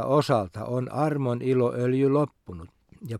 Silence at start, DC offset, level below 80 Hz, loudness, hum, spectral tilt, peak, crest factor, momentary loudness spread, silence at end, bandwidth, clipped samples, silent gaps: 0 s; under 0.1%; -60 dBFS; -25 LUFS; none; -8 dB/octave; -8 dBFS; 16 dB; 20 LU; 0 s; 14.5 kHz; under 0.1%; none